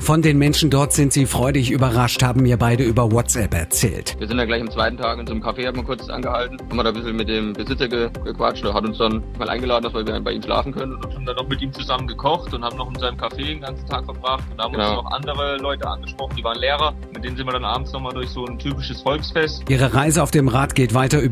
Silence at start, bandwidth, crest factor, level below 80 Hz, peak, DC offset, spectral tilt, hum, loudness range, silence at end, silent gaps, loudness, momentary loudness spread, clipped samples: 0 s; 16 kHz; 18 dB; -32 dBFS; -4 dBFS; under 0.1%; -5 dB/octave; none; 7 LU; 0 s; none; -20 LUFS; 11 LU; under 0.1%